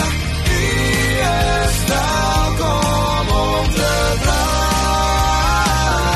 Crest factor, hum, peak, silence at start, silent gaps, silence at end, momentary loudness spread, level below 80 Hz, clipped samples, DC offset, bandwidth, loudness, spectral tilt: 12 dB; none; -4 dBFS; 0 s; none; 0 s; 2 LU; -22 dBFS; under 0.1%; under 0.1%; 13 kHz; -16 LUFS; -4 dB/octave